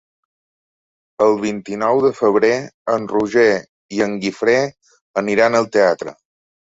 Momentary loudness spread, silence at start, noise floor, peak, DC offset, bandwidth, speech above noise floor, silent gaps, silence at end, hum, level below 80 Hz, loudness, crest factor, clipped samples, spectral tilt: 9 LU; 1.2 s; under -90 dBFS; -2 dBFS; under 0.1%; 8 kHz; over 74 dB; 2.74-2.85 s, 3.69-3.89 s, 5.01-5.14 s; 0.65 s; none; -60 dBFS; -17 LUFS; 16 dB; under 0.1%; -5 dB/octave